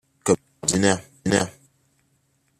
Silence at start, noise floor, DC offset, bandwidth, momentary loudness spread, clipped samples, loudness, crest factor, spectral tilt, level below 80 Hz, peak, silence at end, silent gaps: 0.25 s; -67 dBFS; under 0.1%; 14 kHz; 5 LU; under 0.1%; -23 LUFS; 24 dB; -4 dB/octave; -56 dBFS; 0 dBFS; 1.1 s; none